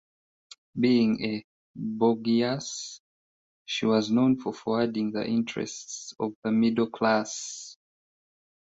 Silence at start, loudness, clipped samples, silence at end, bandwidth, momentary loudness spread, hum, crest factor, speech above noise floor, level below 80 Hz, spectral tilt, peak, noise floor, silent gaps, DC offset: 0.75 s; -27 LUFS; under 0.1%; 0.9 s; 8 kHz; 13 LU; none; 18 dB; over 64 dB; -68 dBFS; -5 dB/octave; -10 dBFS; under -90 dBFS; 1.44-1.74 s, 3.00-3.65 s, 6.35-6.42 s; under 0.1%